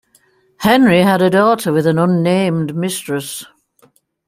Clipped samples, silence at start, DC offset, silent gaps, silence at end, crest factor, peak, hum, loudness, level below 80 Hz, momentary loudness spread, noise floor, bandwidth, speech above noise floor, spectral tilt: under 0.1%; 0.6 s; under 0.1%; none; 0.85 s; 14 dB; 0 dBFS; none; -14 LUFS; -54 dBFS; 12 LU; -55 dBFS; 16 kHz; 42 dB; -6 dB/octave